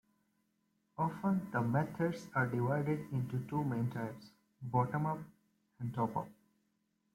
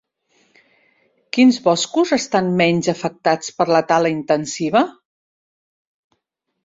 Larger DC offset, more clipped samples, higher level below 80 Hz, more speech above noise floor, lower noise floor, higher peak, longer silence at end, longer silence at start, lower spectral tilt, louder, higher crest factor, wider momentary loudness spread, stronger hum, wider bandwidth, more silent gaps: neither; neither; second, -72 dBFS vs -62 dBFS; second, 44 dB vs 57 dB; first, -80 dBFS vs -74 dBFS; second, -20 dBFS vs -2 dBFS; second, 0.85 s vs 1.75 s; second, 1 s vs 1.35 s; first, -8.5 dB/octave vs -4.5 dB/octave; second, -37 LUFS vs -17 LUFS; about the same, 18 dB vs 18 dB; first, 11 LU vs 6 LU; neither; first, 16 kHz vs 7.8 kHz; neither